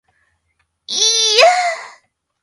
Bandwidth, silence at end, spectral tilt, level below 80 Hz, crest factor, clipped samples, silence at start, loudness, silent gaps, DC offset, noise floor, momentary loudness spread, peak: 15 kHz; 0.55 s; 3.5 dB/octave; -66 dBFS; 18 dB; under 0.1%; 0.9 s; -12 LUFS; none; under 0.1%; -67 dBFS; 13 LU; 0 dBFS